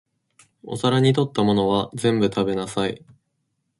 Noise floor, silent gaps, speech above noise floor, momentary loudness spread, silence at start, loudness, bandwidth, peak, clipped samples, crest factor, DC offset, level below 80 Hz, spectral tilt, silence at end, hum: -74 dBFS; none; 53 dB; 8 LU; 0.65 s; -21 LUFS; 11.5 kHz; -6 dBFS; under 0.1%; 16 dB; under 0.1%; -54 dBFS; -6.5 dB/octave; 0.8 s; none